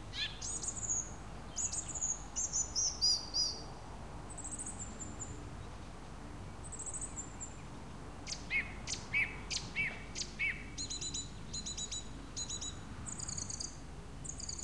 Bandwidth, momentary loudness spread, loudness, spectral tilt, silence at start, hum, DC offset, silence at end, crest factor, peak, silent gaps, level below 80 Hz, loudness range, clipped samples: 13 kHz; 15 LU; -38 LUFS; -1 dB/octave; 0 s; none; 0.2%; 0 s; 20 dB; -22 dBFS; none; -52 dBFS; 11 LU; under 0.1%